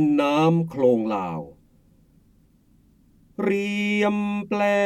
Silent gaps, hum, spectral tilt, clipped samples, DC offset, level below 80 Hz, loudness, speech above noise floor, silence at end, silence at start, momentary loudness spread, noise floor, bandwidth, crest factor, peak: none; none; -7 dB/octave; under 0.1%; under 0.1%; -60 dBFS; -22 LUFS; 37 dB; 0 s; 0 s; 12 LU; -58 dBFS; 13 kHz; 16 dB; -8 dBFS